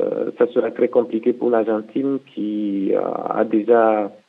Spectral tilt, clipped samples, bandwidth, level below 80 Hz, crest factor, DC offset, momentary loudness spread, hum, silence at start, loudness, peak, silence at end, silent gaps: -9 dB/octave; under 0.1%; 4.1 kHz; -80 dBFS; 16 dB; under 0.1%; 8 LU; none; 0 s; -20 LUFS; -2 dBFS; 0.15 s; none